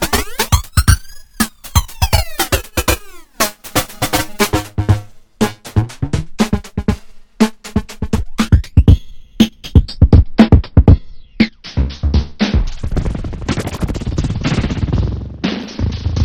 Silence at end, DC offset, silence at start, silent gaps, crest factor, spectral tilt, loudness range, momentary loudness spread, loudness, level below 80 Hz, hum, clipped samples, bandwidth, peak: 0 s; under 0.1%; 0 s; none; 14 dB; -5.5 dB/octave; 7 LU; 11 LU; -16 LUFS; -20 dBFS; none; 0.5%; over 20 kHz; 0 dBFS